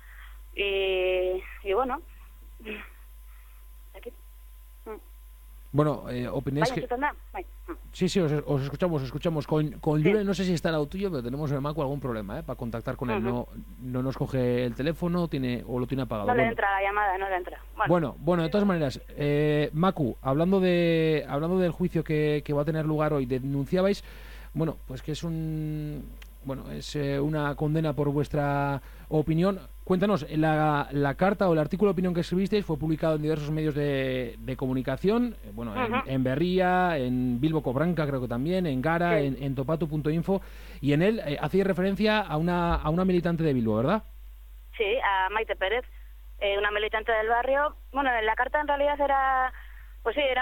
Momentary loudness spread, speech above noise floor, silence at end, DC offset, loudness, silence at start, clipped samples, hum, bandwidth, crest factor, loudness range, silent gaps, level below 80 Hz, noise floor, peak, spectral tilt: 12 LU; 21 dB; 0 s; under 0.1%; -27 LUFS; 0 s; under 0.1%; none; 17.5 kHz; 18 dB; 6 LU; none; -44 dBFS; -47 dBFS; -8 dBFS; -7 dB/octave